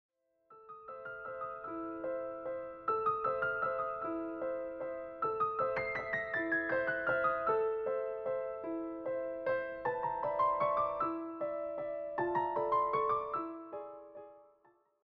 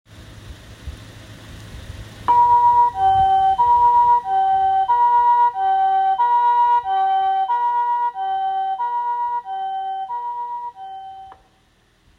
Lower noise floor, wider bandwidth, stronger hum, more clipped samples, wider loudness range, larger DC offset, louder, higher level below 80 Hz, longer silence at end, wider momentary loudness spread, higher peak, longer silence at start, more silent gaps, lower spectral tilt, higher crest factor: first, -70 dBFS vs -58 dBFS; second, 5.8 kHz vs 7.6 kHz; neither; neither; second, 3 LU vs 9 LU; neither; second, -36 LUFS vs -17 LUFS; second, -68 dBFS vs -46 dBFS; second, 0.6 s vs 0.85 s; second, 11 LU vs 23 LU; second, -20 dBFS vs -6 dBFS; first, 0.5 s vs 0.15 s; neither; about the same, -4 dB/octave vs -4.5 dB/octave; about the same, 16 dB vs 12 dB